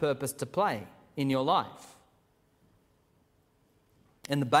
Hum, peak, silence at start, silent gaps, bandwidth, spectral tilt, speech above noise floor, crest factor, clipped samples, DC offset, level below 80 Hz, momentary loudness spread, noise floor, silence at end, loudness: none; -8 dBFS; 0 s; none; 16 kHz; -5 dB/octave; 39 dB; 24 dB; under 0.1%; under 0.1%; -70 dBFS; 22 LU; -68 dBFS; 0 s; -31 LUFS